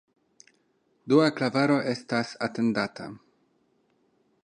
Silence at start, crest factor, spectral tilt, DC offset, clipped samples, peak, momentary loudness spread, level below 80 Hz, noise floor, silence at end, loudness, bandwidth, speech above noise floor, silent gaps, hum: 1.05 s; 22 dB; -6 dB/octave; under 0.1%; under 0.1%; -8 dBFS; 11 LU; -72 dBFS; -69 dBFS; 1.25 s; -26 LUFS; 10.5 kHz; 44 dB; none; none